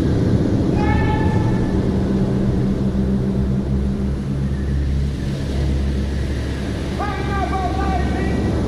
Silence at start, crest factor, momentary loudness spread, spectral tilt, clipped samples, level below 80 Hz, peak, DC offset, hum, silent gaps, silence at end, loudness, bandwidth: 0 s; 14 dB; 5 LU; -8 dB/octave; under 0.1%; -24 dBFS; -4 dBFS; under 0.1%; none; none; 0 s; -20 LUFS; 11.5 kHz